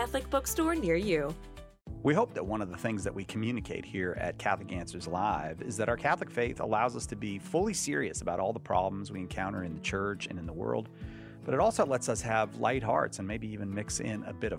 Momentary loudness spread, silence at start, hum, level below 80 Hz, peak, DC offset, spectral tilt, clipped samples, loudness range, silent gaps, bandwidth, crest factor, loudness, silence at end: 9 LU; 0 s; none; -50 dBFS; -14 dBFS; under 0.1%; -5 dB/octave; under 0.1%; 3 LU; none; 16.5 kHz; 20 dB; -32 LUFS; 0 s